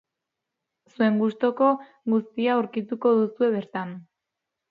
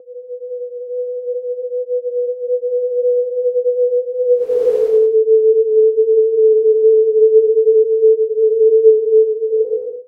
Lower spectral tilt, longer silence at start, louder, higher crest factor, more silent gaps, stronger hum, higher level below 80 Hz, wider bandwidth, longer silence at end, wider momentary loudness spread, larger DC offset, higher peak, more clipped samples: first, -9 dB/octave vs -6.5 dB/octave; first, 1 s vs 0.05 s; second, -24 LUFS vs -14 LUFS; first, 18 dB vs 12 dB; neither; neither; second, -76 dBFS vs -70 dBFS; first, 4.9 kHz vs 1.3 kHz; first, 0.7 s vs 0.05 s; about the same, 10 LU vs 12 LU; neither; second, -8 dBFS vs 0 dBFS; neither